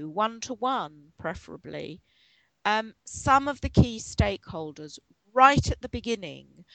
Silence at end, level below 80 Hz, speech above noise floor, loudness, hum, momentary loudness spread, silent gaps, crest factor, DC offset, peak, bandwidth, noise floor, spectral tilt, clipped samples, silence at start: 0.1 s; -42 dBFS; 39 dB; -26 LUFS; none; 20 LU; none; 24 dB; under 0.1%; -4 dBFS; 9.2 kHz; -65 dBFS; -5 dB/octave; under 0.1%; 0 s